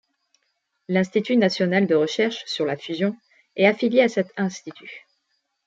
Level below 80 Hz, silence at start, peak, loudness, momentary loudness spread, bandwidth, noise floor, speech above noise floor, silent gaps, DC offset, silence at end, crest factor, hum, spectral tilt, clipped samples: -72 dBFS; 0.9 s; -4 dBFS; -22 LUFS; 18 LU; 7.8 kHz; -74 dBFS; 52 dB; none; under 0.1%; 0.7 s; 20 dB; none; -5.5 dB/octave; under 0.1%